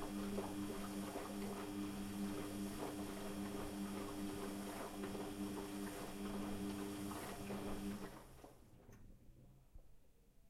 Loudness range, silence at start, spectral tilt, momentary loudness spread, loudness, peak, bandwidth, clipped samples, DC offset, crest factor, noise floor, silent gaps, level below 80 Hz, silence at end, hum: 4 LU; 0 s; -5 dB/octave; 18 LU; -47 LUFS; -30 dBFS; 16.5 kHz; under 0.1%; under 0.1%; 16 dB; -67 dBFS; none; -60 dBFS; 0 s; none